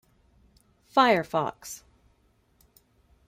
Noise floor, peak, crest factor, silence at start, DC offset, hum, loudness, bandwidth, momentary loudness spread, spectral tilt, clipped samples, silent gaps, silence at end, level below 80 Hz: -66 dBFS; -6 dBFS; 24 dB; 0.95 s; under 0.1%; none; -24 LUFS; 16 kHz; 20 LU; -4 dB/octave; under 0.1%; none; 1.5 s; -64 dBFS